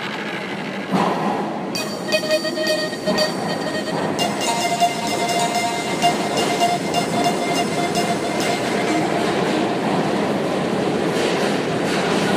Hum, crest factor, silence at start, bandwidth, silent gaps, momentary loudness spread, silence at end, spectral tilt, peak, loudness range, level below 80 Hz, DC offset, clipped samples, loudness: none; 16 dB; 0 s; 15.5 kHz; none; 4 LU; 0 s; -4 dB/octave; -4 dBFS; 2 LU; -58 dBFS; under 0.1%; under 0.1%; -20 LUFS